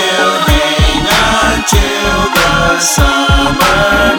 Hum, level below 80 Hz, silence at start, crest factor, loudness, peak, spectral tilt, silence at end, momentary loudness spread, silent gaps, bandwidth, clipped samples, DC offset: none; -18 dBFS; 0 s; 10 dB; -9 LUFS; 0 dBFS; -3.5 dB/octave; 0 s; 2 LU; none; over 20 kHz; under 0.1%; under 0.1%